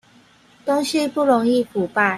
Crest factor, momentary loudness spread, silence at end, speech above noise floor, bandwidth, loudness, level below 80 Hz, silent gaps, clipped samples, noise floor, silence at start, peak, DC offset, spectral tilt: 16 dB; 5 LU; 0 s; 34 dB; 15 kHz; -19 LUFS; -62 dBFS; none; under 0.1%; -52 dBFS; 0.65 s; -4 dBFS; under 0.1%; -4.5 dB/octave